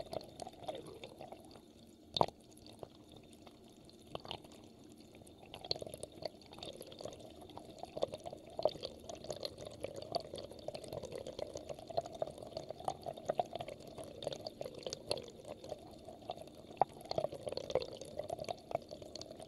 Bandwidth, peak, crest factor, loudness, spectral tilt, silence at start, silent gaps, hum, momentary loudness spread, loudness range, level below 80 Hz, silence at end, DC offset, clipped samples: 15.5 kHz; -10 dBFS; 36 dB; -44 LUFS; -4 dB/octave; 0 s; none; none; 18 LU; 6 LU; -68 dBFS; 0 s; under 0.1%; under 0.1%